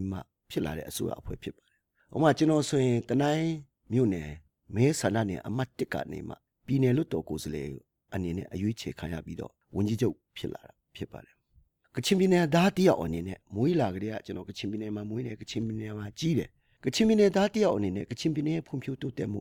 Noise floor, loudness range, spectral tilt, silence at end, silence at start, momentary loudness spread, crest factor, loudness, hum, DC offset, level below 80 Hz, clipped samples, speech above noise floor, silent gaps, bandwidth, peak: -66 dBFS; 7 LU; -6 dB/octave; 0 s; 0 s; 17 LU; 20 dB; -29 LUFS; none; under 0.1%; -56 dBFS; under 0.1%; 37 dB; none; 18 kHz; -10 dBFS